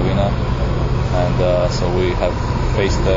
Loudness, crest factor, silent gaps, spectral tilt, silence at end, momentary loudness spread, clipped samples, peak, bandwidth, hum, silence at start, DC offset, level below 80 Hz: -18 LUFS; 12 dB; none; -7 dB/octave; 0 s; 3 LU; under 0.1%; -4 dBFS; 7.6 kHz; none; 0 s; under 0.1%; -22 dBFS